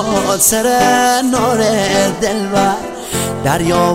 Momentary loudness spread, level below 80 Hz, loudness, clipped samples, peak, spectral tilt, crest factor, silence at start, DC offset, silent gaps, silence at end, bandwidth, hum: 7 LU; -40 dBFS; -13 LUFS; under 0.1%; 0 dBFS; -3.5 dB/octave; 14 dB; 0 s; under 0.1%; none; 0 s; 16.5 kHz; none